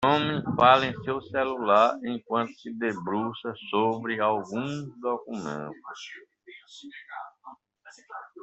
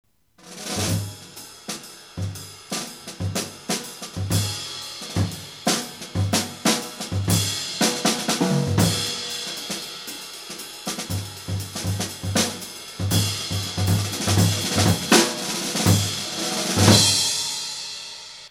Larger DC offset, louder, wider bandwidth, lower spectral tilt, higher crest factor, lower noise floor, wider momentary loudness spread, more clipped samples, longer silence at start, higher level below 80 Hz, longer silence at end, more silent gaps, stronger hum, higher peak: neither; second, -26 LUFS vs -23 LUFS; second, 8.2 kHz vs 17.5 kHz; first, -6 dB/octave vs -3.5 dB/octave; about the same, 24 dB vs 24 dB; first, -51 dBFS vs -47 dBFS; first, 22 LU vs 15 LU; neither; second, 0 s vs 0.45 s; second, -64 dBFS vs -50 dBFS; about the same, 0 s vs 0 s; neither; neither; second, -4 dBFS vs 0 dBFS